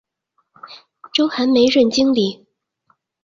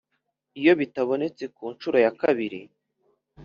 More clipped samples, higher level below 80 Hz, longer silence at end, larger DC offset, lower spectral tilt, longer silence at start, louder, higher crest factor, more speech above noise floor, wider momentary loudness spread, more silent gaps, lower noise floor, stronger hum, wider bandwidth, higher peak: neither; first, -58 dBFS vs -70 dBFS; first, 0.9 s vs 0 s; neither; about the same, -4.5 dB/octave vs -4 dB/octave; about the same, 0.65 s vs 0.55 s; first, -16 LUFS vs -24 LUFS; about the same, 16 dB vs 20 dB; about the same, 53 dB vs 54 dB; second, 8 LU vs 14 LU; neither; second, -68 dBFS vs -77 dBFS; neither; first, 7.6 kHz vs 6.8 kHz; about the same, -4 dBFS vs -6 dBFS